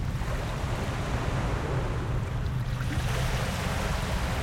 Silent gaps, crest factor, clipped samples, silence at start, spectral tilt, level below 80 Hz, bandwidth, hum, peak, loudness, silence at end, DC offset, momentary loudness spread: none; 14 dB; under 0.1%; 0 s; -5.5 dB/octave; -34 dBFS; 16.5 kHz; none; -16 dBFS; -30 LUFS; 0 s; under 0.1%; 3 LU